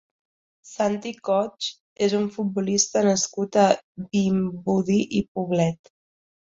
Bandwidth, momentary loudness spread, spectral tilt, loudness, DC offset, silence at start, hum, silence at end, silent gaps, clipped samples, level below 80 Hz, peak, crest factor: 7.8 kHz; 8 LU; -4.5 dB/octave; -23 LUFS; under 0.1%; 0.65 s; none; 0.7 s; 1.80-1.96 s, 3.84-3.95 s, 5.28-5.35 s; under 0.1%; -60 dBFS; -2 dBFS; 22 dB